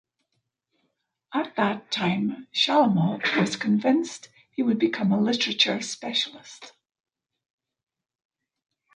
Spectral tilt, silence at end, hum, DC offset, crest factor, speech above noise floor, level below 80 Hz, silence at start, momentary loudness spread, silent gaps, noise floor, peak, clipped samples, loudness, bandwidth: -4.5 dB/octave; 2.25 s; none; under 0.1%; 20 dB; 54 dB; -72 dBFS; 1.3 s; 11 LU; none; -78 dBFS; -6 dBFS; under 0.1%; -24 LUFS; 10.5 kHz